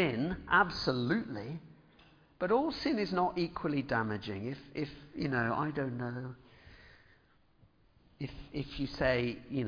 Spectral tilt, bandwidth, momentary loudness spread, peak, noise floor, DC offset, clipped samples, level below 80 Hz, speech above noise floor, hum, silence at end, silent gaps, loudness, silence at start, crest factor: -4.5 dB/octave; 5.4 kHz; 13 LU; -14 dBFS; -66 dBFS; under 0.1%; under 0.1%; -56 dBFS; 33 dB; none; 0 s; none; -34 LUFS; 0 s; 22 dB